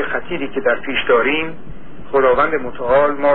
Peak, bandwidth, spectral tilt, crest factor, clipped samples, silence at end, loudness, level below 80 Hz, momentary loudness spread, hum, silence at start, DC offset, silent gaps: -2 dBFS; 4.3 kHz; -8.5 dB/octave; 14 dB; under 0.1%; 0 s; -17 LUFS; -42 dBFS; 9 LU; none; 0 s; 5%; none